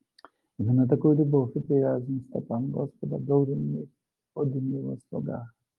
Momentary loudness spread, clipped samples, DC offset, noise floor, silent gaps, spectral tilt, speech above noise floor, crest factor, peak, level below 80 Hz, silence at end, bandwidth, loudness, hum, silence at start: 13 LU; under 0.1%; under 0.1%; -58 dBFS; none; -12.5 dB/octave; 31 dB; 18 dB; -10 dBFS; -70 dBFS; 0.3 s; 4.6 kHz; -27 LUFS; none; 0.6 s